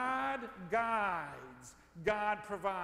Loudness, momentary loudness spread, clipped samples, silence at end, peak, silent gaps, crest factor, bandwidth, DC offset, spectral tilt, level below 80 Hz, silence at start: -36 LUFS; 18 LU; under 0.1%; 0 s; -20 dBFS; none; 18 dB; 15.5 kHz; under 0.1%; -5 dB/octave; -64 dBFS; 0 s